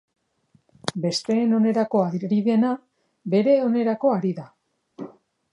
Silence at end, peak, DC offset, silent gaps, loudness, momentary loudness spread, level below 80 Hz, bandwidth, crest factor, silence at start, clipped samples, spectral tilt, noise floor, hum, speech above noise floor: 0.45 s; -2 dBFS; under 0.1%; none; -22 LUFS; 19 LU; -72 dBFS; 11 kHz; 20 dB; 0.85 s; under 0.1%; -6.5 dB/octave; -63 dBFS; none; 43 dB